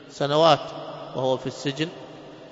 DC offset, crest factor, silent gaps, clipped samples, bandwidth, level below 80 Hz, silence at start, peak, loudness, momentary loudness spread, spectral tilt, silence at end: under 0.1%; 22 dB; none; under 0.1%; 8 kHz; -66 dBFS; 0 s; -4 dBFS; -24 LUFS; 22 LU; -5 dB/octave; 0 s